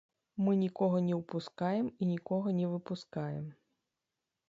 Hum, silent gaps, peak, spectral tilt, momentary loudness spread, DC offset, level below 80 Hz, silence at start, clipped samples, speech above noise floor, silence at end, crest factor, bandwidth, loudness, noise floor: none; none; -18 dBFS; -9 dB/octave; 10 LU; under 0.1%; -76 dBFS; 0.35 s; under 0.1%; 55 dB; 0.95 s; 16 dB; 7.6 kHz; -34 LUFS; -89 dBFS